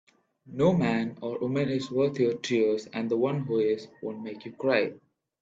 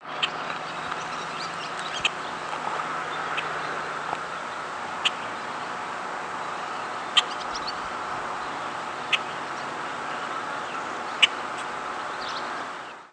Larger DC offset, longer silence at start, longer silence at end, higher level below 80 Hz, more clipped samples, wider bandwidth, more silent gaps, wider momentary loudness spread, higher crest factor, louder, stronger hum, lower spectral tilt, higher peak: neither; first, 0.45 s vs 0 s; first, 0.45 s vs 0 s; about the same, -66 dBFS vs -66 dBFS; neither; second, 7.8 kHz vs 11 kHz; neither; first, 12 LU vs 9 LU; second, 18 dB vs 28 dB; about the same, -28 LUFS vs -29 LUFS; neither; first, -7 dB/octave vs -1.5 dB/octave; second, -10 dBFS vs -4 dBFS